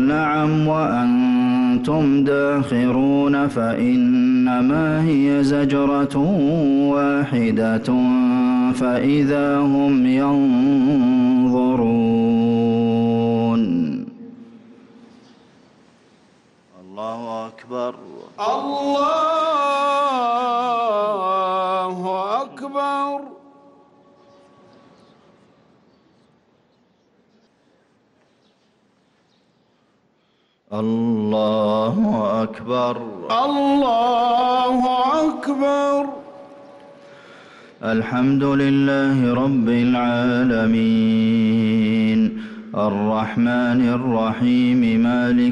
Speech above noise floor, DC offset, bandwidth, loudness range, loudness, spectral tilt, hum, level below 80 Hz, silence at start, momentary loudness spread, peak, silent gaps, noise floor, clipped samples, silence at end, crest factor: 45 dB; under 0.1%; 11 kHz; 11 LU; -18 LUFS; -7.5 dB/octave; none; -54 dBFS; 0 s; 7 LU; -10 dBFS; none; -63 dBFS; under 0.1%; 0 s; 10 dB